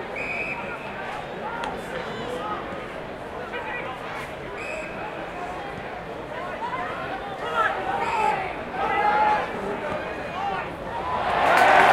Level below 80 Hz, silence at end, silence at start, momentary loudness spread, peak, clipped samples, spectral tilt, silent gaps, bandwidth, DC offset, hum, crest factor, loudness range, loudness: -50 dBFS; 0 s; 0 s; 12 LU; -4 dBFS; under 0.1%; -4.5 dB/octave; none; 16.5 kHz; under 0.1%; none; 22 dB; 8 LU; -26 LUFS